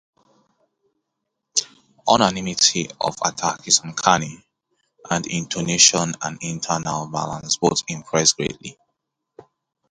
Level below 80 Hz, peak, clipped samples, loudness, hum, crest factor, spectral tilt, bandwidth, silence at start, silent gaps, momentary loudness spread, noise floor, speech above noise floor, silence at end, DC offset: -56 dBFS; 0 dBFS; under 0.1%; -20 LUFS; none; 22 dB; -2 dB/octave; 11.5 kHz; 1.55 s; none; 12 LU; -79 dBFS; 58 dB; 0.5 s; under 0.1%